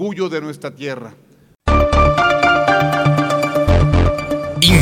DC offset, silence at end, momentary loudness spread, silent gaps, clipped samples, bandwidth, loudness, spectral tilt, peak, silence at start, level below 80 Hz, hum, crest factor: under 0.1%; 0 s; 14 LU; none; under 0.1%; 17.5 kHz; -15 LUFS; -5.5 dB/octave; 0 dBFS; 0 s; -24 dBFS; none; 14 dB